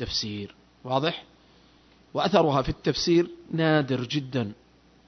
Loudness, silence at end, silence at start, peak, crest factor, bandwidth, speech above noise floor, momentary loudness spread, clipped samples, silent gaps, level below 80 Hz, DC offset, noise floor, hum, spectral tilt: -26 LUFS; 0.55 s; 0 s; -6 dBFS; 20 dB; 6.4 kHz; 32 dB; 14 LU; under 0.1%; none; -48 dBFS; under 0.1%; -57 dBFS; none; -5.5 dB/octave